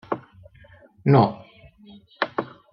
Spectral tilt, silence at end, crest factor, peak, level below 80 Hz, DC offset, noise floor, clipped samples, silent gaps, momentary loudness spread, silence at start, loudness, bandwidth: -10 dB/octave; 0.25 s; 22 dB; -4 dBFS; -60 dBFS; under 0.1%; -51 dBFS; under 0.1%; none; 15 LU; 0.1 s; -23 LUFS; 5.8 kHz